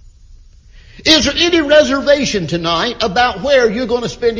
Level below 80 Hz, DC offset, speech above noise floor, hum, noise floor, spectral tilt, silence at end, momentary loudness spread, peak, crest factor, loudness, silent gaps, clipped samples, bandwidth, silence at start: -38 dBFS; under 0.1%; 28 dB; none; -41 dBFS; -3.5 dB/octave; 0 s; 7 LU; 0 dBFS; 14 dB; -13 LUFS; none; under 0.1%; 7.6 kHz; 0.3 s